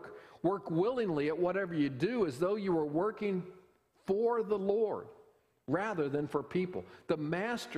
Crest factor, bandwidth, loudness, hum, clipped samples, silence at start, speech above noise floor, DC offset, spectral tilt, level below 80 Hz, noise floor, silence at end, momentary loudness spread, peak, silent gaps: 16 dB; 14 kHz; -34 LUFS; none; under 0.1%; 0 s; 32 dB; under 0.1%; -7 dB/octave; -70 dBFS; -65 dBFS; 0 s; 8 LU; -18 dBFS; none